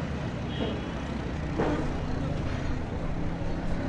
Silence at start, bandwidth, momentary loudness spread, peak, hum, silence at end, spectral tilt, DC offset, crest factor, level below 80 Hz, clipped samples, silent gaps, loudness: 0 s; 9.6 kHz; 5 LU; -16 dBFS; none; 0 s; -7 dB/octave; under 0.1%; 14 dB; -36 dBFS; under 0.1%; none; -32 LUFS